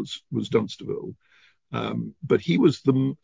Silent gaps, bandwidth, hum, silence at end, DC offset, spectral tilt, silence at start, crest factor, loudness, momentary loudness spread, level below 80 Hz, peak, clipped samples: none; 7.6 kHz; none; 0.1 s; under 0.1%; -7.5 dB/octave; 0 s; 18 dB; -25 LUFS; 14 LU; -60 dBFS; -6 dBFS; under 0.1%